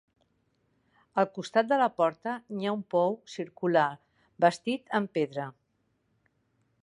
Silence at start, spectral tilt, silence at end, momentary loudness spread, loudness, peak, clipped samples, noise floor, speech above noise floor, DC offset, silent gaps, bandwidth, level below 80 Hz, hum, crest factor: 1.15 s; -6 dB/octave; 1.3 s; 10 LU; -29 LUFS; -8 dBFS; under 0.1%; -75 dBFS; 46 dB; under 0.1%; none; 11 kHz; -80 dBFS; none; 22 dB